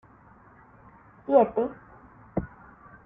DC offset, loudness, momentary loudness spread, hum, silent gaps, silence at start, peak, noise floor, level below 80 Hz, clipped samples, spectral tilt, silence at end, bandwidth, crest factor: under 0.1%; -26 LUFS; 23 LU; none; none; 1.3 s; -8 dBFS; -54 dBFS; -54 dBFS; under 0.1%; -11.5 dB/octave; 0.6 s; 3.7 kHz; 22 dB